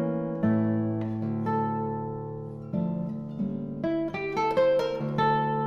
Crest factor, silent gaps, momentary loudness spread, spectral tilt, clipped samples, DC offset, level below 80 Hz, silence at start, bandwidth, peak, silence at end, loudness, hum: 16 dB; none; 9 LU; -8.5 dB/octave; under 0.1%; under 0.1%; -58 dBFS; 0 s; 7 kHz; -12 dBFS; 0 s; -28 LUFS; none